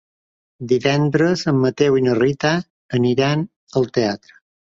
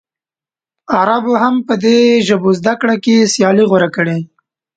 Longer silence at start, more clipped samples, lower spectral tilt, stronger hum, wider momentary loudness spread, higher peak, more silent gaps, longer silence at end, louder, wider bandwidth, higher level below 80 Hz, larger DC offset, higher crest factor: second, 0.6 s vs 0.9 s; neither; first, -6.5 dB/octave vs -5 dB/octave; neither; about the same, 7 LU vs 7 LU; about the same, -2 dBFS vs 0 dBFS; first, 2.70-2.89 s, 3.56-3.67 s vs none; about the same, 0.6 s vs 0.5 s; second, -18 LUFS vs -12 LUFS; second, 7.8 kHz vs 9.2 kHz; about the same, -54 dBFS vs -58 dBFS; neither; first, 18 dB vs 12 dB